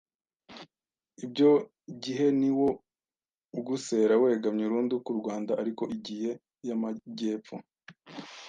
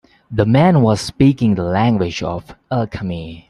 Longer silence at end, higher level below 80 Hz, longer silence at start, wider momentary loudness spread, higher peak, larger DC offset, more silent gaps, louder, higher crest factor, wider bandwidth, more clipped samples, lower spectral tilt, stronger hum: about the same, 0 s vs 0.1 s; second, -74 dBFS vs -42 dBFS; first, 0.5 s vs 0.3 s; first, 21 LU vs 13 LU; second, -12 dBFS vs 0 dBFS; neither; first, 3.35-3.40 s vs none; second, -29 LUFS vs -16 LUFS; about the same, 18 dB vs 16 dB; second, 9.4 kHz vs 12 kHz; neither; about the same, -6 dB/octave vs -7 dB/octave; neither